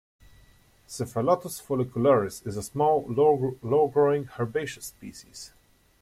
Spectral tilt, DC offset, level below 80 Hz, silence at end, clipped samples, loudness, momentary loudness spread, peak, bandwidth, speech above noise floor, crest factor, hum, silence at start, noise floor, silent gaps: -6 dB/octave; under 0.1%; -60 dBFS; 0.55 s; under 0.1%; -26 LUFS; 20 LU; -10 dBFS; 15.5 kHz; 32 dB; 18 dB; none; 0.9 s; -58 dBFS; none